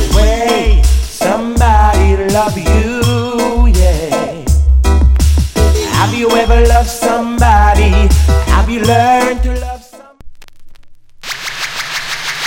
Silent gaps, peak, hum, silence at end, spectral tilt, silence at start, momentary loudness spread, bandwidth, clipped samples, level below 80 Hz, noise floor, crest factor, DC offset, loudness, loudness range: none; 0 dBFS; none; 0 s; -5.5 dB/octave; 0 s; 9 LU; 16.5 kHz; 0.1%; -12 dBFS; -35 dBFS; 10 dB; under 0.1%; -12 LUFS; 5 LU